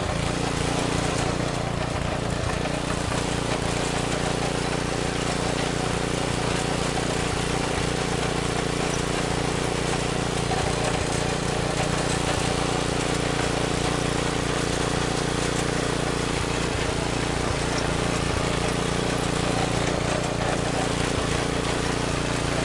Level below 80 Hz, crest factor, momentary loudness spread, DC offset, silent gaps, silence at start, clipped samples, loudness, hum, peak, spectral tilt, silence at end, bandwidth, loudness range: -36 dBFS; 14 dB; 2 LU; under 0.1%; none; 0 s; under 0.1%; -25 LUFS; none; -10 dBFS; -4.5 dB/octave; 0 s; 11.5 kHz; 1 LU